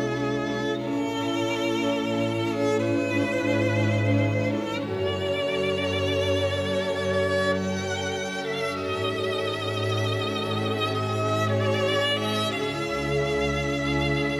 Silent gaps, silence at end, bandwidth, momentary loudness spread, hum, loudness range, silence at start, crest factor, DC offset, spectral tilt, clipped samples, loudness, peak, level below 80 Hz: none; 0 s; 13.5 kHz; 4 LU; none; 2 LU; 0 s; 14 dB; under 0.1%; -5.5 dB/octave; under 0.1%; -25 LUFS; -12 dBFS; -50 dBFS